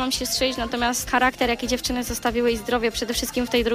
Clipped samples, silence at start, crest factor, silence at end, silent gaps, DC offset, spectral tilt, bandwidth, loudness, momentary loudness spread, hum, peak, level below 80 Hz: under 0.1%; 0 s; 16 dB; 0 s; none; under 0.1%; -2.5 dB/octave; 15.5 kHz; -23 LUFS; 4 LU; none; -8 dBFS; -40 dBFS